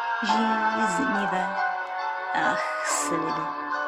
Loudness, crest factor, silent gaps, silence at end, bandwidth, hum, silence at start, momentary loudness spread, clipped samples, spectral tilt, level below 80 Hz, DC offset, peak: -25 LUFS; 14 dB; none; 0 s; 14.5 kHz; none; 0 s; 6 LU; under 0.1%; -3 dB/octave; -68 dBFS; under 0.1%; -12 dBFS